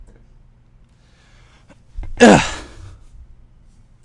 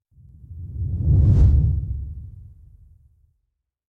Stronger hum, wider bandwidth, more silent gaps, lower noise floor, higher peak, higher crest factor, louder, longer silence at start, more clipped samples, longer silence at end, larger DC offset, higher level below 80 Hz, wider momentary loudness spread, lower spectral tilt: neither; first, 11.5 kHz vs 1.6 kHz; neither; second, -51 dBFS vs -76 dBFS; first, 0 dBFS vs -6 dBFS; about the same, 20 dB vs 16 dB; first, -12 LUFS vs -20 LUFS; first, 1.95 s vs 0.5 s; neither; about the same, 1.45 s vs 1.45 s; neither; second, -38 dBFS vs -24 dBFS; first, 28 LU vs 23 LU; second, -4.5 dB/octave vs -11.5 dB/octave